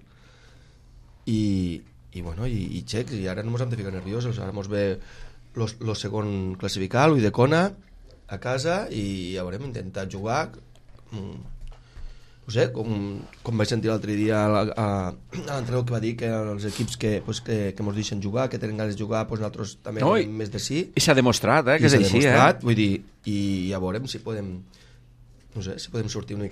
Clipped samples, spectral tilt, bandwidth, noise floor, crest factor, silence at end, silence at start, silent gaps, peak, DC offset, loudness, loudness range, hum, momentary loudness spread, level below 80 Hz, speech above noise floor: under 0.1%; -5.5 dB/octave; 15 kHz; -52 dBFS; 22 dB; 0 s; 0.95 s; none; -2 dBFS; under 0.1%; -25 LUFS; 11 LU; none; 16 LU; -48 dBFS; 27 dB